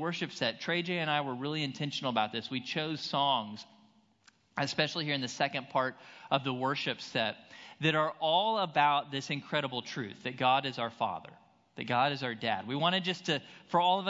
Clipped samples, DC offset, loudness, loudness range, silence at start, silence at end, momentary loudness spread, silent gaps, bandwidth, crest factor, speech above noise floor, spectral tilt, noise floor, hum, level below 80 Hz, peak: under 0.1%; under 0.1%; -32 LUFS; 3 LU; 0 s; 0 s; 8 LU; none; 7.6 kHz; 22 dB; 34 dB; -2.5 dB/octave; -66 dBFS; none; -80 dBFS; -10 dBFS